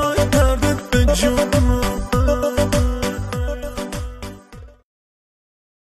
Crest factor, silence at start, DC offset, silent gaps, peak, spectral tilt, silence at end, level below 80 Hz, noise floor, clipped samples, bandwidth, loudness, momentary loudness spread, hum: 16 dB; 0 s; under 0.1%; none; -4 dBFS; -5.5 dB/octave; 1.15 s; -24 dBFS; -40 dBFS; under 0.1%; 14 kHz; -19 LUFS; 13 LU; none